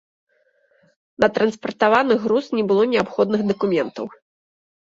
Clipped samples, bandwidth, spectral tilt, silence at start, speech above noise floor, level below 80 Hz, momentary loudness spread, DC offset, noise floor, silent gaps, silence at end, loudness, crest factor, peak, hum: under 0.1%; 7.8 kHz; -6.5 dB/octave; 1.2 s; 43 dB; -60 dBFS; 6 LU; under 0.1%; -62 dBFS; none; 0.7 s; -19 LUFS; 18 dB; -2 dBFS; none